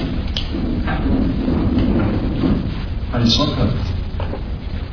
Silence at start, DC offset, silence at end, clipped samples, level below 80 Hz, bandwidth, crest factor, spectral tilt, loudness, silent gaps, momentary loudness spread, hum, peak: 0 s; under 0.1%; 0 s; under 0.1%; -24 dBFS; 5.4 kHz; 16 dB; -6.5 dB/octave; -20 LUFS; none; 10 LU; none; -2 dBFS